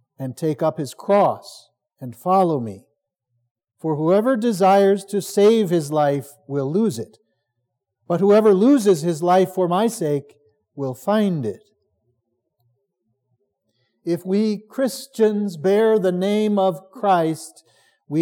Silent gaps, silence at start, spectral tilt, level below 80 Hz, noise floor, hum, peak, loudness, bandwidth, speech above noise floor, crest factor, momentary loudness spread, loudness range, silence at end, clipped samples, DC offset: 3.51-3.55 s; 0.2 s; -6.5 dB/octave; -84 dBFS; -77 dBFS; none; -6 dBFS; -19 LUFS; 18 kHz; 58 dB; 16 dB; 14 LU; 9 LU; 0 s; under 0.1%; under 0.1%